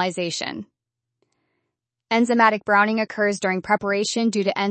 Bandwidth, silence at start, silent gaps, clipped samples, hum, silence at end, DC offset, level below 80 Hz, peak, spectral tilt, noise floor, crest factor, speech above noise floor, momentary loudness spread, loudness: 8.8 kHz; 0 s; none; under 0.1%; none; 0 s; under 0.1%; -68 dBFS; -4 dBFS; -4 dB/octave; -80 dBFS; 20 dB; 60 dB; 9 LU; -21 LUFS